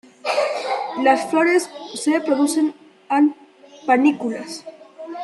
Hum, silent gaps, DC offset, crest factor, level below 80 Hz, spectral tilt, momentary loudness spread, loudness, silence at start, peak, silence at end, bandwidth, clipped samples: none; none; under 0.1%; 18 dB; -76 dBFS; -3 dB/octave; 14 LU; -20 LUFS; 0.25 s; -2 dBFS; 0 s; 12.5 kHz; under 0.1%